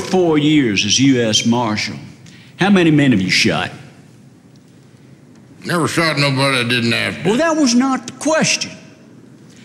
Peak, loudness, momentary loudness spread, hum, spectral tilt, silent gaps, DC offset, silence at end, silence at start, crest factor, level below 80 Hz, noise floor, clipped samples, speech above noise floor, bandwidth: -4 dBFS; -15 LUFS; 9 LU; none; -4 dB/octave; none; under 0.1%; 0.85 s; 0 s; 14 dB; -54 dBFS; -44 dBFS; under 0.1%; 30 dB; 14 kHz